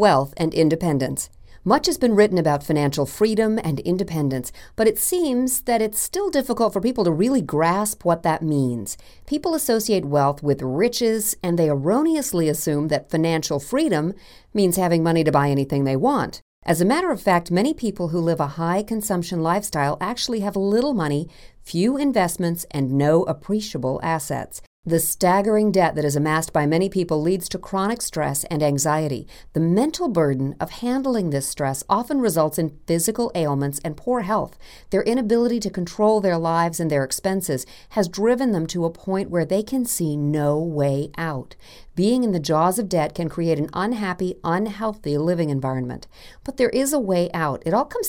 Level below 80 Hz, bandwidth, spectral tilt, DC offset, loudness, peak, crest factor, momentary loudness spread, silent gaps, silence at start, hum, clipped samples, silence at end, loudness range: -48 dBFS; 17 kHz; -5.5 dB/octave; under 0.1%; -21 LUFS; -2 dBFS; 18 dB; 7 LU; 16.42-16.62 s, 24.67-24.83 s; 0 s; none; under 0.1%; 0 s; 2 LU